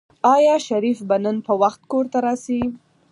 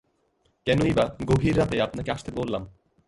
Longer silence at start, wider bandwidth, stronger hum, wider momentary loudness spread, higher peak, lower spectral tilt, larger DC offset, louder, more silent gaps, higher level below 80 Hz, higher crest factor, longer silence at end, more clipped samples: second, 0.25 s vs 0.65 s; about the same, 11.5 kHz vs 11.5 kHz; neither; about the same, 9 LU vs 10 LU; first, -4 dBFS vs -8 dBFS; second, -5.5 dB/octave vs -7 dB/octave; neither; first, -20 LUFS vs -25 LUFS; neither; second, -56 dBFS vs -44 dBFS; about the same, 16 dB vs 18 dB; about the same, 0.35 s vs 0.35 s; neither